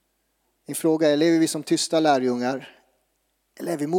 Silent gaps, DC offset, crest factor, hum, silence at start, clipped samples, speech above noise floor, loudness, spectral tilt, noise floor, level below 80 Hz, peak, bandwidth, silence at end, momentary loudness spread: none; under 0.1%; 16 dB; none; 0.7 s; under 0.1%; 50 dB; -22 LUFS; -4.5 dB/octave; -72 dBFS; -78 dBFS; -8 dBFS; 16.5 kHz; 0 s; 13 LU